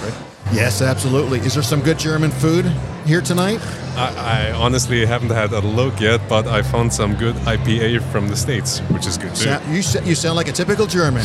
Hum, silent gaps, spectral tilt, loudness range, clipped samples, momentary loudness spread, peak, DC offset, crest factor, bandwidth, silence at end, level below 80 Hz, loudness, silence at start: none; none; -5 dB/octave; 1 LU; under 0.1%; 4 LU; 0 dBFS; under 0.1%; 18 dB; 15 kHz; 0 s; -36 dBFS; -18 LUFS; 0 s